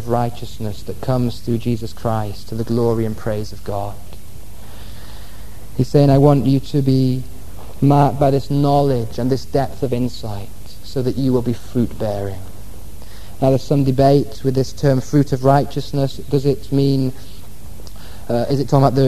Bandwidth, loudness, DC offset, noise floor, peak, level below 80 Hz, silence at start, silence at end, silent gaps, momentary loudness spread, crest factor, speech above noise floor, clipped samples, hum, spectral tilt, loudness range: 13.5 kHz; -18 LUFS; 6%; -38 dBFS; 0 dBFS; -38 dBFS; 0 s; 0 s; none; 24 LU; 18 dB; 21 dB; under 0.1%; none; -8 dB/octave; 7 LU